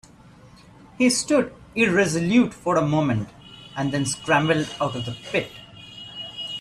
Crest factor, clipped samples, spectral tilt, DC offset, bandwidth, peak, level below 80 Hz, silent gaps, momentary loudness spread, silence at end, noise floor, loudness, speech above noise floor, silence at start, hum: 16 dB; under 0.1%; -4.5 dB/octave; under 0.1%; 13 kHz; -6 dBFS; -54 dBFS; none; 17 LU; 0 s; -49 dBFS; -22 LUFS; 27 dB; 1 s; none